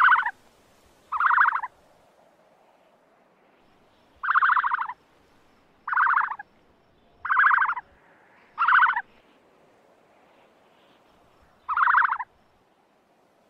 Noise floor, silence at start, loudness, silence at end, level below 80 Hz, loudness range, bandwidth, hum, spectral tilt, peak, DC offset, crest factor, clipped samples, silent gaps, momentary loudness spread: -63 dBFS; 0 s; -22 LUFS; 1.25 s; -70 dBFS; 4 LU; 5.8 kHz; none; -1.5 dB/octave; -10 dBFS; under 0.1%; 18 dB; under 0.1%; none; 20 LU